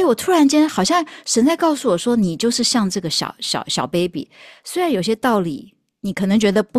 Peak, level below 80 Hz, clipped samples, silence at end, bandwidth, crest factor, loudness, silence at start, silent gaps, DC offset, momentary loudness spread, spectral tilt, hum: -4 dBFS; -56 dBFS; under 0.1%; 0 s; 14.5 kHz; 14 dB; -18 LUFS; 0 s; none; under 0.1%; 12 LU; -4 dB/octave; none